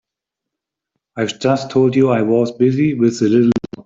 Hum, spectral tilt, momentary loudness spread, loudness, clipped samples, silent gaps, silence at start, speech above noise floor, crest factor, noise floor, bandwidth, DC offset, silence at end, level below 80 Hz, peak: none; -7 dB/octave; 7 LU; -15 LUFS; under 0.1%; none; 1.15 s; 69 dB; 14 dB; -83 dBFS; 7.8 kHz; under 0.1%; 0.05 s; -56 dBFS; -2 dBFS